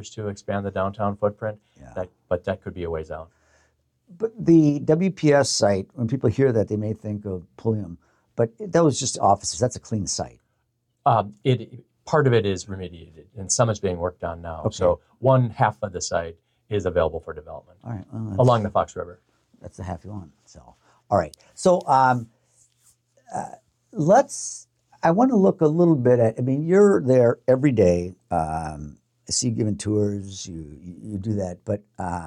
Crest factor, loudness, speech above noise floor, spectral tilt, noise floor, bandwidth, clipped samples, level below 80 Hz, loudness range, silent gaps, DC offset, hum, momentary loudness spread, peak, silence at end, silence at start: 16 dB; -22 LUFS; 50 dB; -6 dB/octave; -72 dBFS; 11.5 kHz; under 0.1%; -54 dBFS; 8 LU; none; under 0.1%; none; 18 LU; -6 dBFS; 0 s; 0 s